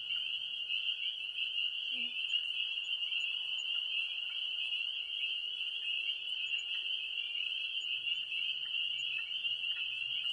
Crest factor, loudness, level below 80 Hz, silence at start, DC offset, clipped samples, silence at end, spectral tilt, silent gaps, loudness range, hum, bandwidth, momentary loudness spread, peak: 14 dB; -34 LUFS; -82 dBFS; 0 s; under 0.1%; under 0.1%; 0 s; 1.5 dB/octave; none; 1 LU; none; 11.5 kHz; 2 LU; -24 dBFS